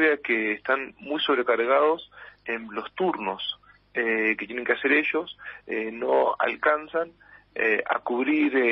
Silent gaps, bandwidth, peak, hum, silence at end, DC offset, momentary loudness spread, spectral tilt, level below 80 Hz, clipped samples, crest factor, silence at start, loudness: none; 5.8 kHz; -8 dBFS; none; 0 s; under 0.1%; 12 LU; -1 dB/octave; -68 dBFS; under 0.1%; 18 dB; 0 s; -25 LUFS